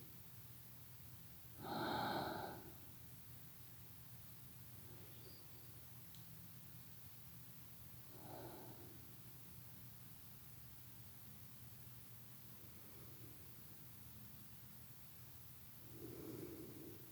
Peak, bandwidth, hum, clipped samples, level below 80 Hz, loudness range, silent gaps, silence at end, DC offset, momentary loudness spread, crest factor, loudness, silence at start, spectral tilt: -32 dBFS; over 20 kHz; none; under 0.1%; -76 dBFS; 6 LU; none; 0 s; under 0.1%; 6 LU; 22 dB; -53 LUFS; 0 s; -4.5 dB/octave